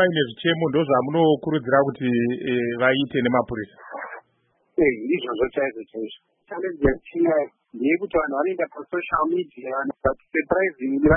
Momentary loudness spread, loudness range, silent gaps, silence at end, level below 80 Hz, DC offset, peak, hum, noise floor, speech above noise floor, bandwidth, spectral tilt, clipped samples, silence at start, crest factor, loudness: 13 LU; 4 LU; none; 0 s; -46 dBFS; under 0.1%; -4 dBFS; none; -67 dBFS; 45 dB; 3.9 kHz; -11 dB/octave; under 0.1%; 0 s; 18 dB; -23 LUFS